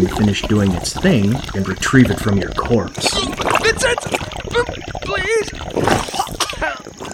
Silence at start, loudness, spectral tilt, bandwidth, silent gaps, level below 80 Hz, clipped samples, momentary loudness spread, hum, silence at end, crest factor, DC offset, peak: 0 s; -17 LUFS; -4.5 dB/octave; 17 kHz; none; -34 dBFS; under 0.1%; 8 LU; none; 0 s; 18 dB; under 0.1%; 0 dBFS